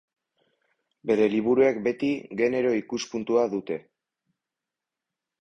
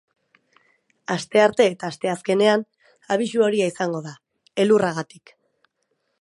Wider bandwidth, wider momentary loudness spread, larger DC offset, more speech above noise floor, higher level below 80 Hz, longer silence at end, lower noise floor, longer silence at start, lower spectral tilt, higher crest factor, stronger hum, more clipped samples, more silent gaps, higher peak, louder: second, 7.8 kHz vs 11.5 kHz; second, 10 LU vs 14 LU; neither; first, 64 dB vs 52 dB; about the same, -66 dBFS vs -70 dBFS; first, 1.6 s vs 1.2 s; first, -88 dBFS vs -73 dBFS; about the same, 1.05 s vs 1.1 s; about the same, -5.5 dB/octave vs -5 dB/octave; about the same, 18 dB vs 20 dB; neither; neither; neither; second, -10 dBFS vs -2 dBFS; second, -25 LUFS vs -21 LUFS